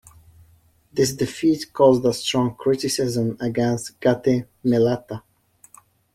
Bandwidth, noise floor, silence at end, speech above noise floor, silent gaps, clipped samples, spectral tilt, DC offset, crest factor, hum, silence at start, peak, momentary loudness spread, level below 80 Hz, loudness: 15.5 kHz; -57 dBFS; 0.95 s; 36 dB; none; under 0.1%; -5.5 dB/octave; under 0.1%; 18 dB; none; 0.95 s; -2 dBFS; 7 LU; -54 dBFS; -21 LUFS